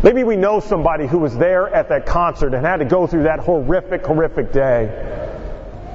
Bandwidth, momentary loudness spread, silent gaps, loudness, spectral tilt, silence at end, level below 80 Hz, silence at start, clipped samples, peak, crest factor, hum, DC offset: 7.4 kHz; 12 LU; none; -17 LUFS; -8.5 dB/octave; 0 s; -28 dBFS; 0 s; under 0.1%; 0 dBFS; 16 dB; none; under 0.1%